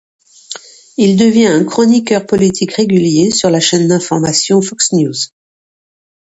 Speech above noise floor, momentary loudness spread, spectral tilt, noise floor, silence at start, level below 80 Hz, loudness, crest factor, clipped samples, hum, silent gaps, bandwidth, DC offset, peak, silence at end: 21 dB; 13 LU; -4.5 dB/octave; -31 dBFS; 0.5 s; -50 dBFS; -11 LUFS; 12 dB; under 0.1%; none; none; 8.4 kHz; under 0.1%; 0 dBFS; 1.05 s